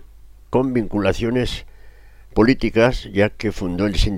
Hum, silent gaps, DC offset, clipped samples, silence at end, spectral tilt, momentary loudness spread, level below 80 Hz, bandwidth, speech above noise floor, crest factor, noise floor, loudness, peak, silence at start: none; none; under 0.1%; under 0.1%; 0 s; -6.5 dB/octave; 8 LU; -30 dBFS; 15 kHz; 25 dB; 16 dB; -43 dBFS; -20 LUFS; -4 dBFS; 0 s